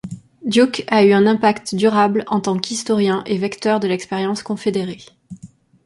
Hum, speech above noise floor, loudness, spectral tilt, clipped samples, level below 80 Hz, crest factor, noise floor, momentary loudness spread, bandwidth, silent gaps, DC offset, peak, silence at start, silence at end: none; 27 dB; -17 LUFS; -5 dB/octave; under 0.1%; -58 dBFS; 16 dB; -43 dBFS; 9 LU; 11.5 kHz; none; under 0.1%; -2 dBFS; 0.05 s; 0.4 s